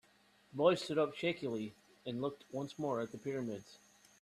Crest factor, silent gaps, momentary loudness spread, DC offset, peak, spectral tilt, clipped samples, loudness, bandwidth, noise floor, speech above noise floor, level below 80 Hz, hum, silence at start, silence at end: 22 dB; none; 15 LU; under 0.1%; -16 dBFS; -5.5 dB/octave; under 0.1%; -38 LUFS; 13.5 kHz; -69 dBFS; 32 dB; -78 dBFS; none; 0.55 s; 0.45 s